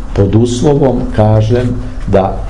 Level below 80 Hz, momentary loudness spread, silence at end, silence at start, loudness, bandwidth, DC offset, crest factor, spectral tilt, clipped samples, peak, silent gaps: -22 dBFS; 4 LU; 0 s; 0 s; -11 LUFS; 10.5 kHz; 5%; 10 dB; -7.5 dB/octave; under 0.1%; 0 dBFS; none